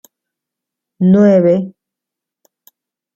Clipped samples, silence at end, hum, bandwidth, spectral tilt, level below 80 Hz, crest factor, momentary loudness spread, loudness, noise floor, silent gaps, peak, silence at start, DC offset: under 0.1%; 1.45 s; none; 12.5 kHz; -10 dB/octave; -58 dBFS; 14 dB; 10 LU; -11 LUFS; -83 dBFS; none; -2 dBFS; 1 s; under 0.1%